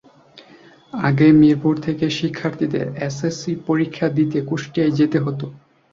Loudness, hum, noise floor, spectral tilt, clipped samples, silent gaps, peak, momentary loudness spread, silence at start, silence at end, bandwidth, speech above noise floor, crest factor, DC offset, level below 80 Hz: -19 LUFS; none; -47 dBFS; -7 dB/octave; under 0.1%; none; -2 dBFS; 12 LU; 0.35 s; 0.35 s; 7.6 kHz; 29 dB; 16 dB; under 0.1%; -56 dBFS